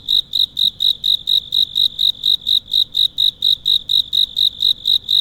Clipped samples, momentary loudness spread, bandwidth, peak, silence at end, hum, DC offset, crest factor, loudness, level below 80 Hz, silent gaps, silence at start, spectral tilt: under 0.1%; 2 LU; 17 kHz; -6 dBFS; 0 s; none; under 0.1%; 12 dB; -14 LUFS; -50 dBFS; none; 0.05 s; 0 dB/octave